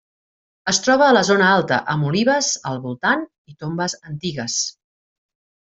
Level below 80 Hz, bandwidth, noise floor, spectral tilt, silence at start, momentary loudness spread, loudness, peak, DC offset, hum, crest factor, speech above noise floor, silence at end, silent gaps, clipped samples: -60 dBFS; 8.2 kHz; under -90 dBFS; -3.5 dB/octave; 0.65 s; 14 LU; -19 LUFS; -2 dBFS; under 0.1%; none; 18 dB; over 71 dB; 1.05 s; 3.38-3.45 s; under 0.1%